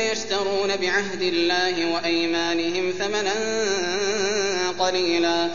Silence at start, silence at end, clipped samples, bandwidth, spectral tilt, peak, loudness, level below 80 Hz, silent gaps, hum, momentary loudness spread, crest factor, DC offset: 0 s; 0 s; under 0.1%; 7.4 kHz; -2.5 dB/octave; -8 dBFS; -22 LUFS; -60 dBFS; none; none; 3 LU; 14 dB; 1%